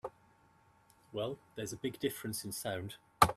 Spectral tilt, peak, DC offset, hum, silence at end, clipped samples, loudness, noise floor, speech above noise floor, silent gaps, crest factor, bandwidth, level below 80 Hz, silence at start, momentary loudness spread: -4 dB/octave; -8 dBFS; under 0.1%; none; 0 s; under 0.1%; -39 LUFS; -67 dBFS; 27 dB; none; 30 dB; 15 kHz; -60 dBFS; 0.05 s; 8 LU